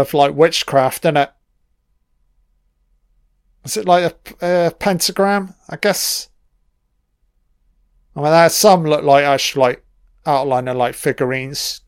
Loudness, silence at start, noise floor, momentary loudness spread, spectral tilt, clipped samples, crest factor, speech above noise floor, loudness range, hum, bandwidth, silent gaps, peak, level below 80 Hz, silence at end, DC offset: -16 LUFS; 0 s; -65 dBFS; 12 LU; -4 dB/octave; under 0.1%; 18 dB; 50 dB; 7 LU; none; 16.5 kHz; none; 0 dBFS; -54 dBFS; 0.1 s; under 0.1%